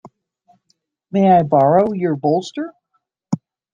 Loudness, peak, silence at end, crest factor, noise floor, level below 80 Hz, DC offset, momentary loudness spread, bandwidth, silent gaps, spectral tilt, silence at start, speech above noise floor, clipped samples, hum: -17 LUFS; -2 dBFS; 0.35 s; 16 dB; -70 dBFS; -60 dBFS; under 0.1%; 15 LU; 7.4 kHz; none; -8 dB/octave; 0.05 s; 55 dB; under 0.1%; none